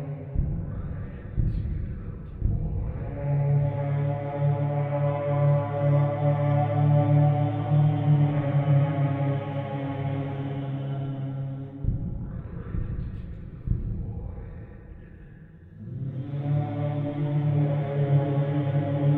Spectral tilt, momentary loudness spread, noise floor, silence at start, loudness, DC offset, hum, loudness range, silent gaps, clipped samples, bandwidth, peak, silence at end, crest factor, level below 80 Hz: -12 dB/octave; 14 LU; -47 dBFS; 0 s; -27 LUFS; under 0.1%; none; 12 LU; none; under 0.1%; 3.7 kHz; -10 dBFS; 0 s; 16 dB; -38 dBFS